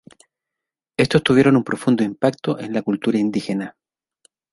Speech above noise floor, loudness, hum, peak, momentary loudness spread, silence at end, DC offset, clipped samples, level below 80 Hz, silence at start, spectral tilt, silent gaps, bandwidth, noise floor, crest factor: 67 dB; -19 LUFS; none; -2 dBFS; 12 LU; 0.85 s; under 0.1%; under 0.1%; -54 dBFS; 1 s; -6.5 dB/octave; none; 11.5 kHz; -86 dBFS; 18 dB